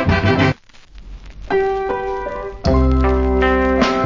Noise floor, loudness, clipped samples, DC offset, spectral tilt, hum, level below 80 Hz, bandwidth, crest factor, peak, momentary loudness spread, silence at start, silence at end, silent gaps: -40 dBFS; -17 LUFS; under 0.1%; under 0.1%; -7 dB/octave; none; -24 dBFS; 7.6 kHz; 16 dB; 0 dBFS; 9 LU; 0 s; 0 s; none